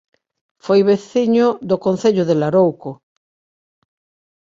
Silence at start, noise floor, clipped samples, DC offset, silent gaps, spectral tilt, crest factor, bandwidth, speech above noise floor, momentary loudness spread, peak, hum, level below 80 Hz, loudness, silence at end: 0.65 s; under -90 dBFS; under 0.1%; under 0.1%; none; -7 dB/octave; 16 dB; 7.6 kHz; over 75 dB; 11 LU; -2 dBFS; none; -62 dBFS; -16 LUFS; 1.65 s